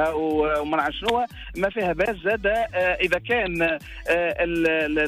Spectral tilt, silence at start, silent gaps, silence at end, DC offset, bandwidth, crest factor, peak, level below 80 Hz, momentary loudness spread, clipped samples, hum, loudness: -5.5 dB/octave; 0 s; none; 0 s; under 0.1%; 15.5 kHz; 14 dB; -10 dBFS; -42 dBFS; 4 LU; under 0.1%; none; -23 LUFS